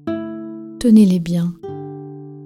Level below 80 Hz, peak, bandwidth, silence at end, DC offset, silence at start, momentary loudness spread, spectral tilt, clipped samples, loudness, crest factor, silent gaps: -50 dBFS; -2 dBFS; 12 kHz; 0 s; under 0.1%; 0.05 s; 20 LU; -8 dB/octave; under 0.1%; -16 LUFS; 16 dB; none